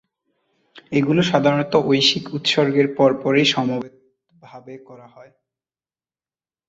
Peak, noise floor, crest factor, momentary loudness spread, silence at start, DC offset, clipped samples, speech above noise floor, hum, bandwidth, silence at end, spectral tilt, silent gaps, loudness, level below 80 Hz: -2 dBFS; under -90 dBFS; 20 dB; 17 LU; 0.75 s; under 0.1%; under 0.1%; over 71 dB; none; 8 kHz; 1.75 s; -5 dB/octave; none; -18 LUFS; -62 dBFS